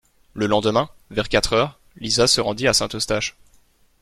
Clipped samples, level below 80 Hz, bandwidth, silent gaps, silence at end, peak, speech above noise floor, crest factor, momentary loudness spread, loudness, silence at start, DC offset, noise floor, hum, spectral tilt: under 0.1%; -42 dBFS; 15.5 kHz; none; 0.7 s; -4 dBFS; 36 dB; 18 dB; 10 LU; -20 LUFS; 0.35 s; under 0.1%; -57 dBFS; none; -3 dB/octave